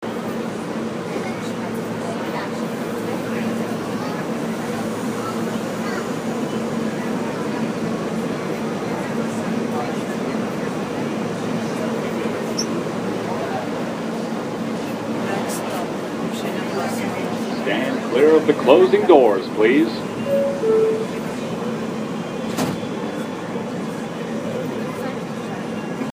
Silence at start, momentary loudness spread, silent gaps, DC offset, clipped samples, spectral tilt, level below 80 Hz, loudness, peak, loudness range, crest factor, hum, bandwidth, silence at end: 0 s; 10 LU; none; under 0.1%; under 0.1%; -5.5 dB/octave; -58 dBFS; -22 LUFS; 0 dBFS; 9 LU; 22 dB; none; 15.5 kHz; 0 s